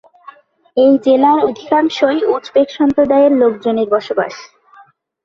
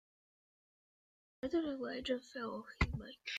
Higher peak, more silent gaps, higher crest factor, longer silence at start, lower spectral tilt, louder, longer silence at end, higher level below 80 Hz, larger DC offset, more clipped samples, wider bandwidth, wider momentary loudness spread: first, -2 dBFS vs -18 dBFS; neither; second, 12 dB vs 24 dB; second, 0.75 s vs 1.45 s; about the same, -5.5 dB/octave vs -6 dB/octave; first, -13 LUFS vs -41 LUFS; first, 0.8 s vs 0 s; about the same, -56 dBFS vs -52 dBFS; neither; neither; second, 7.2 kHz vs 9.2 kHz; about the same, 9 LU vs 7 LU